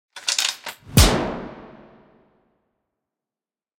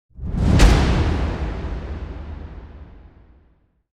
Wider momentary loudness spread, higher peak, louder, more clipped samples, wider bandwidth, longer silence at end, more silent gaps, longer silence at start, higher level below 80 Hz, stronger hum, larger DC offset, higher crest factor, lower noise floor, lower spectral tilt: about the same, 20 LU vs 22 LU; about the same, 0 dBFS vs -2 dBFS; about the same, -20 LUFS vs -20 LUFS; neither; first, 16.5 kHz vs 12.5 kHz; first, 2.1 s vs 0.95 s; neither; about the same, 0.15 s vs 0.15 s; second, -32 dBFS vs -22 dBFS; neither; neither; about the same, 24 dB vs 20 dB; first, under -90 dBFS vs -59 dBFS; second, -3.5 dB/octave vs -6 dB/octave